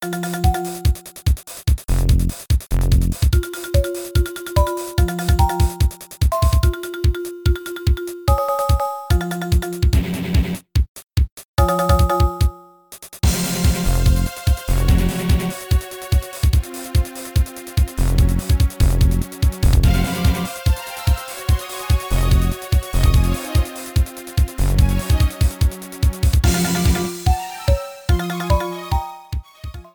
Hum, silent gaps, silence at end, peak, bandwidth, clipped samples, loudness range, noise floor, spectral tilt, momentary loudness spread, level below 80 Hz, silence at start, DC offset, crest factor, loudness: none; 10.89-10.95 s, 11.32-11.37 s, 11.45-11.54 s; 0.15 s; -2 dBFS; over 20 kHz; under 0.1%; 2 LU; -42 dBFS; -5.5 dB/octave; 6 LU; -20 dBFS; 0 s; under 0.1%; 16 dB; -20 LUFS